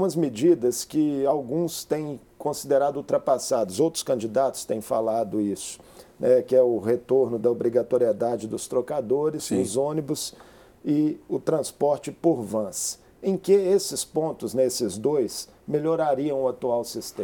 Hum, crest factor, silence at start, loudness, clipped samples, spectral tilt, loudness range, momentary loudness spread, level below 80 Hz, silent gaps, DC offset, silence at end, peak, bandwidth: none; 16 dB; 0 s; -25 LUFS; under 0.1%; -5 dB/octave; 3 LU; 9 LU; -64 dBFS; none; under 0.1%; 0 s; -8 dBFS; 19.5 kHz